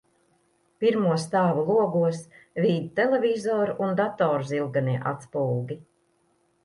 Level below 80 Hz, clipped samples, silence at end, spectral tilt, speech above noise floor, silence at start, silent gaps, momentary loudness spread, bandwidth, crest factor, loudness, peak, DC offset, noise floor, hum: -70 dBFS; under 0.1%; 0.8 s; -7 dB/octave; 43 dB; 0.8 s; none; 8 LU; 11.5 kHz; 16 dB; -25 LUFS; -10 dBFS; under 0.1%; -68 dBFS; none